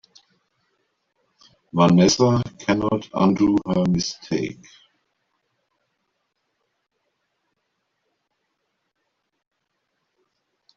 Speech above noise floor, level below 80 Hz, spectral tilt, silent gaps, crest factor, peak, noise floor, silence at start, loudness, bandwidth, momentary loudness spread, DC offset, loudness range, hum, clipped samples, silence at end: 56 dB; -54 dBFS; -6 dB/octave; none; 22 dB; -4 dBFS; -75 dBFS; 1.75 s; -20 LUFS; 7.6 kHz; 11 LU; under 0.1%; 13 LU; none; under 0.1%; 6.25 s